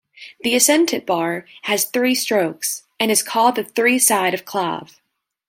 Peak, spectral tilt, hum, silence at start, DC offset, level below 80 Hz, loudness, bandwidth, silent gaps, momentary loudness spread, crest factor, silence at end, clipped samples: 0 dBFS; -2 dB/octave; none; 0.2 s; under 0.1%; -70 dBFS; -18 LUFS; 17 kHz; none; 10 LU; 18 dB; 0.65 s; under 0.1%